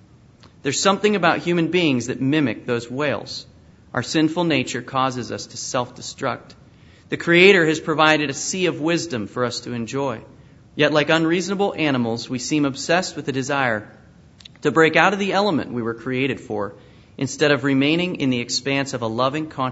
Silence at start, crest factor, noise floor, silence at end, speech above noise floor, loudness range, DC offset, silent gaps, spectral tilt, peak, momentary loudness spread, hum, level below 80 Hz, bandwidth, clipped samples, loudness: 0.65 s; 20 dB; -49 dBFS; 0 s; 29 dB; 5 LU; under 0.1%; none; -4.5 dB/octave; 0 dBFS; 12 LU; none; -58 dBFS; 8 kHz; under 0.1%; -20 LUFS